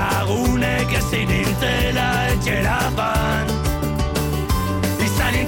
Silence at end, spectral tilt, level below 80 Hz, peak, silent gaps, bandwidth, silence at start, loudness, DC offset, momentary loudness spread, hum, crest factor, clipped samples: 0 s; -5 dB/octave; -28 dBFS; -8 dBFS; none; 17 kHz; 0 s; -20 LUFS; under 0.1%; 3 LU; none; 12 dB; under 0.1%